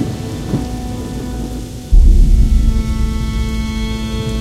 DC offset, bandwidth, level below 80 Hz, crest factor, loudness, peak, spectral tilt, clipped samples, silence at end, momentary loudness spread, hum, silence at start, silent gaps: under 0.1%; 12.5 kHz; -14 dBFS; 14 dB; -18 LUFS; 0 dBFS; -6.5 dB/octave; under 0.1%; 0 s; 11 LU; none; 0 s; none